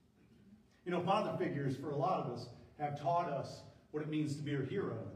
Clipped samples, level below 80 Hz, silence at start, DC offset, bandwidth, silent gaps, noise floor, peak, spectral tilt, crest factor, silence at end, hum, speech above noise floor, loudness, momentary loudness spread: under 0.1%; -74 dBFS; 0.45 s; under 0.1%; 11.5 kHz; none; -65 dBFS; -22 dBFS; -7 dB/octave; 18 dB; 0 s; none; 27 dB; -38 LUFS; 13 LU